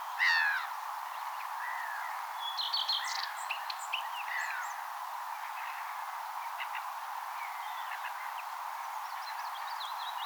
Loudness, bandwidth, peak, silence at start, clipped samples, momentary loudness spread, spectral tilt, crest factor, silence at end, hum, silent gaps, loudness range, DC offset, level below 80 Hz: -36 LUFS; over 20 kHz; -18 dBFS; 0 s; under 0.1%; 9 LU; 8 dB/octave; 20 dB; 0 s; none; none; 5 LU; under 0.1%; under -90 dBFS